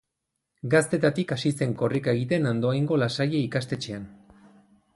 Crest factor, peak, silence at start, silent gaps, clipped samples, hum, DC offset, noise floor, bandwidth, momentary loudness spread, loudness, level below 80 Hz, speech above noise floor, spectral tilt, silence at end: 18 dB; -8 dBFS; 0.65 s; none; under 0.1%; none; under 0.1%; -82 dBFS; 11.5 kHz; 10 LU; -25 LUFS; -60 dBFS; 57 dB; -6 dB/octave; 0.8 s